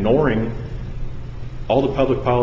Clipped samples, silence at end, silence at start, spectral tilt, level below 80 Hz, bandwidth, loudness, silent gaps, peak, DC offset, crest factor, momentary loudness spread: under 0.1%; 0 s; 0 s; -8.5 dB/octave; -32 dBFS; 7.4 kHz; -20 LUFS; none; -4 dBFS; under 0.1%; 16 dB; 16 LU